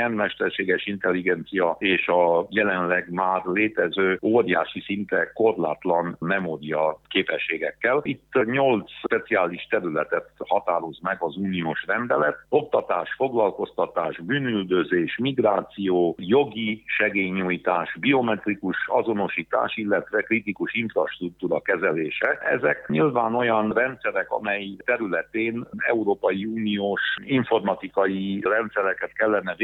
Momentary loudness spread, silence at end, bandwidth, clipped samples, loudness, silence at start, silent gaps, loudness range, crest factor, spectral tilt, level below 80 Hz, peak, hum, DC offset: 5 LU; 0 s; 4.1 kHz; under 0.1%; -24 LUFS; 0 s; none; 2 LU; 18 dB; -8.5 dB/octave; -64 dBFS; -6 dBFS; none; under 0.1%